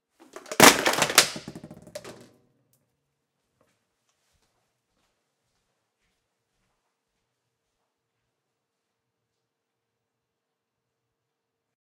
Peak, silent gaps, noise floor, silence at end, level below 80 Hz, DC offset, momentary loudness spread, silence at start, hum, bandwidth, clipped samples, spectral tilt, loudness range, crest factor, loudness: 0 dBFS; none; -83 dBFS; 9.85 s; -66 dBFS; under 0.1%; 23 LU; 0.5 s; none; 16 kHz; under 0.1%; -1.5 dB/octave; 12 LU; 30 dB; -18 LUFS